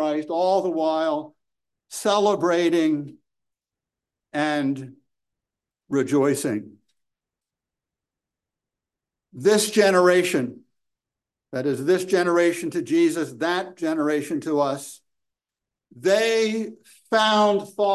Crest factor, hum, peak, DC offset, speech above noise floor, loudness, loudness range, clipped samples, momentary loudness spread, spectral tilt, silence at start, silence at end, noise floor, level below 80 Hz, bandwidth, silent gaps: 20 dB; none; -4 dBFS; under 0.1%; 67 dB; -22 LUFS; 6 LU; under 0.1%; 12 LU; -4.5 dB/octave; 0 s; 0 s; -88 dBFS; -74 dBFS; 12.5 kHz; none